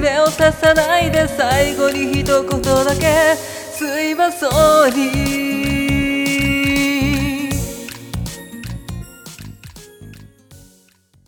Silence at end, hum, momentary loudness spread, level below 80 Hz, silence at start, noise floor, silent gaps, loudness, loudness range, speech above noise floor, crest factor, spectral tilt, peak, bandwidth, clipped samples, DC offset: 0.7 s; none; 17 LU; -34 dBFS; 0 s; -54 dBFS; none; -16 LUFS; 13 LU; 39 dB; 16 dB; -4.5 dB/octave; 0 dBFS; 19 kHz; under 0.1%; under 0.1%